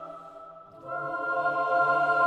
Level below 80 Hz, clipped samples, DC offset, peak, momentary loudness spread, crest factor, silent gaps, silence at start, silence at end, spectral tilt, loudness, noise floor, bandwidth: -74 dBFS; under 0.1%; under 0.1%; -12 dBFS; 22 LU; 14 dB; none; 0 s; 0 s; -5.5 dB/octave; -27 LUFS; -47 dBFS; 9 kHz